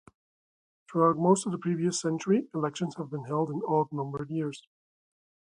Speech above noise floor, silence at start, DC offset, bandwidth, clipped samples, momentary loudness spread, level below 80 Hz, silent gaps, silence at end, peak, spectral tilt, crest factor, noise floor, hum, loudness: over 62 dB; 0.9 s; under 0.1%; 11 kHz; under 0.1%; 10 LU; -72 dBFS; none; 0.95 s; -10 dBFS; -6 dB/octave; 20 dB; under -90 dBFS; none; -29 LUFS